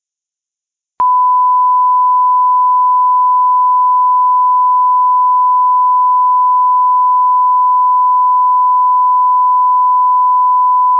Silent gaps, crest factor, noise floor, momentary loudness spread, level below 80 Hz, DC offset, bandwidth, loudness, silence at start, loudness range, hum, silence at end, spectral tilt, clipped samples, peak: none; 4 dB; -84 dBFS; 0 LU; -72 dBFS; under 0.1%; 1.4 kHz; -10 LUFS; 1 s; 0 LU; none; 0 s; -5 dB/octave; under 0.1%; -6 dBFS